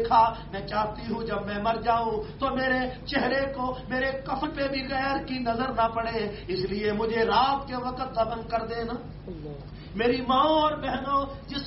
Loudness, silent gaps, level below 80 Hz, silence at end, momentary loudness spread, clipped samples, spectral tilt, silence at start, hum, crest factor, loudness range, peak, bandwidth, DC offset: -27 LUFS; none; -46 dBFS; 0 s; 10 LU; under 0.1%; -3 dB/octave; 0 s; none; 18 dB; 2 LU; -8 dBFS; 6 kHz; under 0.1%